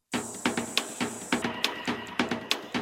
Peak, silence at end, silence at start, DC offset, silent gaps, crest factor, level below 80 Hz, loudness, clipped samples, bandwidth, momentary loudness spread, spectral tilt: -4 dBFS; 0 s; 0.1 s; under 0.1%; none; 26 dB; -64 dBFS; -30 LUFS; under 0.1%; 16.5 kHz; 5 LU; -2.5 dB/octave